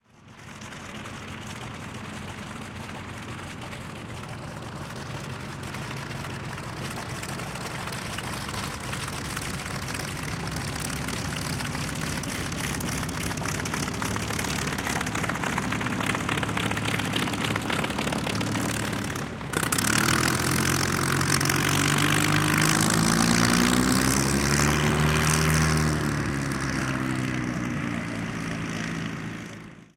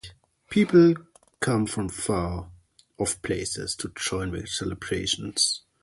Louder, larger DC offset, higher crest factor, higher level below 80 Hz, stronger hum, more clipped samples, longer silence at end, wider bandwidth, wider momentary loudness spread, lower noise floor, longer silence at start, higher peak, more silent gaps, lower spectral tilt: about the same, -26 LUFS vs -25 LUFS; neither; about the same, 22 dB vs 20 dB; first, -42 dBFS vs -48 dBFS; neither; neither; second, 0.1 s vs 0.25 s; first, 17 kHz vs 11.5 kHz; first, 15 LU vs 12 LU; about the same, -47 dBFS vs -49 dBFS; first, 0.25 s vs 0.05 s; about the same, -4 dBFS vs -6 dBFS; neither; about the same, -4 dB/octave vs -4 dB/octave